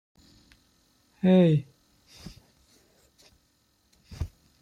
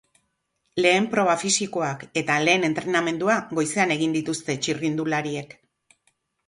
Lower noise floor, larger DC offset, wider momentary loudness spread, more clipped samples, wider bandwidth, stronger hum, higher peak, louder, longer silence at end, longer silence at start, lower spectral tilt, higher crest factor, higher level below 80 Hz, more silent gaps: second, -68 dBFS vs -74 dBFS; neither; first, 28 LU vs 8 LU; neither; second, 7.4 kHz vs 11.5 kHz; neither; second, -12 dBFS vs -6 dBFS; about the same, -25 LUFS vs -23 LUFS; second, 0.35 s vs 1 s; first, 1.25 s vs 0.75 s; first, -8.5 dB/octave vs -3.5 dB/octave; about the same, 18 dB vs 18 dB; first, -52 dBFS vs -66 dBFS; neither